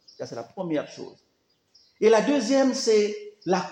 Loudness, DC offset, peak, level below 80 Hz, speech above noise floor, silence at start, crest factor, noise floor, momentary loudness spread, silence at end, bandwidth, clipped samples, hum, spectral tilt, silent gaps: -23 LUFS; under 0.1%; -8 dBFS; -78 dBFS; 46 dB; 0.2 s; 16 dB; -69 dBFS; 17 LU; 0 s; 10 kHz; under 0.1%; none; -4.5 dB/octave; none